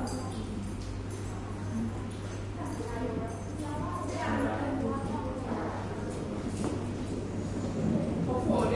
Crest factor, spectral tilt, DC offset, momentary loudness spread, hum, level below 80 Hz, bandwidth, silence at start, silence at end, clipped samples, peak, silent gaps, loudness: 18 dB; -7 dB/octave; under 0.1%; 7 LU; none; -46 dBFS; 11.5 kHz; 0 s; 0 s; under 0.1%; -16 dBFS; none; -34 LUFS